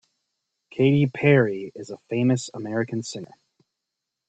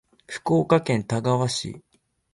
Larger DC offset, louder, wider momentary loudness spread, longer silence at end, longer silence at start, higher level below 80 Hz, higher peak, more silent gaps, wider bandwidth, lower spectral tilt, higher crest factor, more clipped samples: neither; about the same, -23 LUFS vs -23 LUFS; about the same, 18 LU vs 17 LU; first, 1.05 s vs 0.55 s; first, 0.75 s vs 0.3 s; second, -64 dBFS vs -58 dBFS; about the same, -4 dBFS vs -6 dBFS; neither; second, 8.8 kHz vs 11.5 kHz; about the same, -6.5 dB/octave vs -6 dB/octave; about the same, 20 dB vs 18 dB; neither